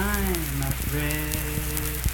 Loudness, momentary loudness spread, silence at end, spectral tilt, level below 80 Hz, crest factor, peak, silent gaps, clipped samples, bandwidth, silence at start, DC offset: -27 LUFS; 2 LU; 0 s; -4 dB/octave; -30 dBFS; 22 dB; -4 dBFS; none; under 0.1%; 19 kHz; 0 s; under 0.1%